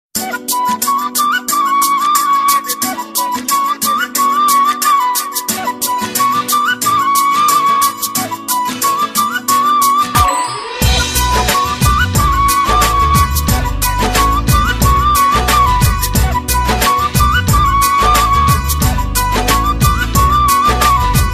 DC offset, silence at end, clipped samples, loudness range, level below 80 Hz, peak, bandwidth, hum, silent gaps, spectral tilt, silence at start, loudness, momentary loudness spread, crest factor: under 0.1%; 0 s; under 0.1%; 2 LU; -20 dBFS; 0 dBFS; 16 kHz; none; none; -3 dB/octave; 0.15 s; -12 LUFS; 6 LU; 12 dB